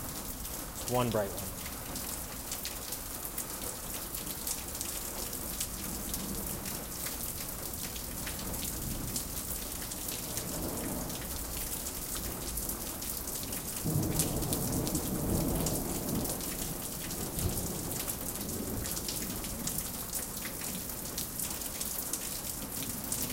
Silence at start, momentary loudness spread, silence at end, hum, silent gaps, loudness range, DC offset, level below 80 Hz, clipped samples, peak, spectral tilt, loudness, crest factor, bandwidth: 0 s; 5 LU; 0 s; none; none; 3 LU; under 0.1%; -46 dBFS; under 0.1%; -10 dBFS; -3.5 dB/octave; -35 LUFS; 26 dB; 17 kHz